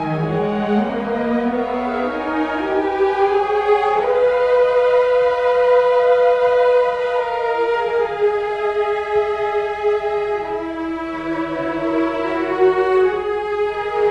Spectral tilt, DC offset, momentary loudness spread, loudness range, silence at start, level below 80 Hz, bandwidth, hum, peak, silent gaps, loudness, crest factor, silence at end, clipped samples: -7 dB/octave; under 0.1%; 7 LU; 6 LU; 0 s; -48 dBFS; 8 kHz; none; -4 dBFS; none; -18 LUFS; 14 dB; 0 s; under 0.1%